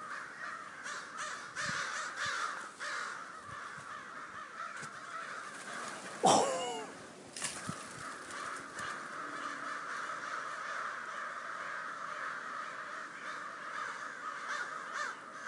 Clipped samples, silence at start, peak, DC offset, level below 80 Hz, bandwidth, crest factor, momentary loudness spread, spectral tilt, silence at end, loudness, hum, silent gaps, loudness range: under 0.1%; 0 s; -14 dBFS; under 0.1%; -82 dBFS; 11.5 kHz; 26 dB; 9 LU; -2 dB/octave; 0 s; -39 LUFS; none; none; 6 LU